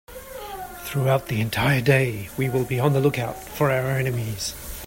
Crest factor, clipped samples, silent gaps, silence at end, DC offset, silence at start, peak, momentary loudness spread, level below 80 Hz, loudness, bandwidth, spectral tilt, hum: 18 dB; under 0.1%; none; 0 s; under 0.1%; 0.1 s; -6 dBFS; 14 LU; -46 dBFS; -23 LUFS; 16.5 kHz; -5.5 dB/octave; none